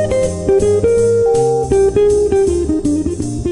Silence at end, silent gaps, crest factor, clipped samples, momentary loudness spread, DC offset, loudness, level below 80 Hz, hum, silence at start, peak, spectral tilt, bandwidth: 0 s; none; 12 dB; under 0.1%; 5 LU; 0.5%; -14 LUFS; -30 dBFS; none; 0 s; -2 dBFS; -6.5 dB/octave; 11 kHz